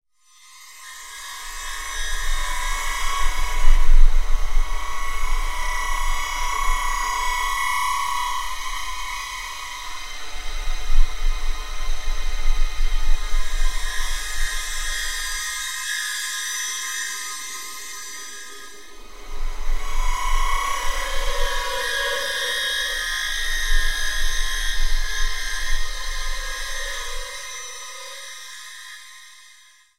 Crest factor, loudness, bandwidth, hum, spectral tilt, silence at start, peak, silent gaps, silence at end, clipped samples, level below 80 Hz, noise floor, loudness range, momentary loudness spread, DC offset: 20 dB; -26 LUFS; 15.5 kHz; none; -0.5 dB/octave; 0.55 s; 0 dBFS; none; 0.65 s; under 0.1%; -22 dBFS; -52 dBFS; 7 LU; 12 LU; under 0.1%